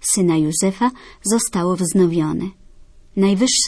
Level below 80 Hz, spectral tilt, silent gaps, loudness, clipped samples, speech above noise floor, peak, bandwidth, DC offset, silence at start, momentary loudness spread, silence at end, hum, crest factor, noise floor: -48 dBFS; -4.5 dB/octave; none; -18 LUFS; under 0.1%; 26 dB; -4 dBFS; 11 kHz; under 0.1%; 0 s; 10 LU; 0 s; none; 14 dB; -44 dBFS